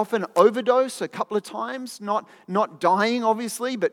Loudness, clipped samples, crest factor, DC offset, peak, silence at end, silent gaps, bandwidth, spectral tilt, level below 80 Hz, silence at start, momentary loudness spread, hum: -23 LUFS; under 0.1%; 20 dB; under 0.1%; -4 dBFS; 0.05 s; none; 16.5 kHz; -4.5 dB/octave; -88 dBFS; 0 s; 11 LU; none